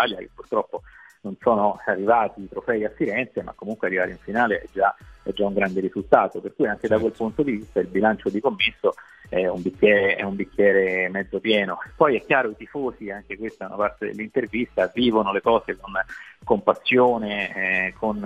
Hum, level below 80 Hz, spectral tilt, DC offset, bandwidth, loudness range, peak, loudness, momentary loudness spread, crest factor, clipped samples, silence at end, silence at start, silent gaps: none; -52 dBFS; -6.5 dB/octave; under 0.1%; 8.8 kHz; 3 LU; 0 dBFS; -23 LUFS; 13 LU; 22 dB; under 0.1%; 0 s; 0 s; none